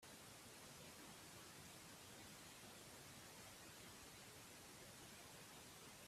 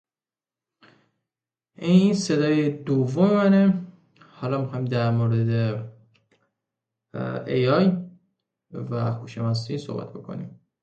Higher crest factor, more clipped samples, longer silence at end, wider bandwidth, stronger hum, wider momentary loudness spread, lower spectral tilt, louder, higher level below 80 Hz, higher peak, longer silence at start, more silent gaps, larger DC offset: about the same, 14 dB vs 18 dB; neither; second, 0 s vs 0.3 s; first, 15.5 kHz vs 8.8 kHz; neither; second, 1 LU vs 18 LU; second, -2.5 dB/octave vs -7.5 dB/octave; second, -59 LUFS vs -23 LUFS; second, -80 dBFS vs -62 dBFS; second, -48 dBFS vs -6 dBFS; second, 0 s vs 1.8 s; neither; neither